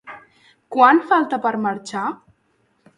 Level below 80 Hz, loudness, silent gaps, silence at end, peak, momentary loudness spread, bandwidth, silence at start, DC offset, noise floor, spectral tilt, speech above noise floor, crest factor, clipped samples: -70 dBFS; -18 LUFS; none; 0.85 s; 0 dBFS; 17 LU; 11 kHz; 0.05 s; under 0.1%; -64 dBFS; -5 dB/octave; 47 dB; 20 dB; under 0.1%